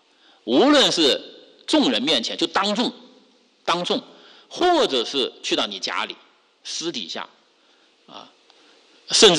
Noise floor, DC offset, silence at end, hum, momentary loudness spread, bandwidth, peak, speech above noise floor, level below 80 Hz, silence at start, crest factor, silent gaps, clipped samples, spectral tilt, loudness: -58 dBFS; under 0.1%; 0 s; none; 17 LU; 11.5 kHz; -2 dBFS; 38 dB; -60 dBFS; 0.45 s; 20 dB; none; under 0.1%; -2.5 dB/octave; -21 LUFS